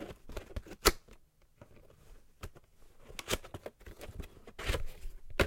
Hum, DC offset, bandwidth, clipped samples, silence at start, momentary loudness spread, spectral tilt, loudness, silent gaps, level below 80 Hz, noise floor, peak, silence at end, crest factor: none; under 0.1%; 16.5 kHz; under 0.1%; 0 s; 22 LU; -3 dB/octave; -37 LUFS; none; -46 dBFS; -61 dBFS; -6 dBFS; 0 s; 32 dB